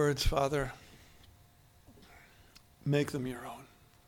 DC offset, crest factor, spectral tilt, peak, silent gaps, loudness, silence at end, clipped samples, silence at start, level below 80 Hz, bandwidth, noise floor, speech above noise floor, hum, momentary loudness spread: under 0.1%; 20 dB; -5.5 dB/octave; -16 dBFS; none; -34 LUFS; 0.45 s; under 0.1%; 0 s; -44 dBFS; 18.5 kHz; -62 dBFS; 30 dB; none; 26 LU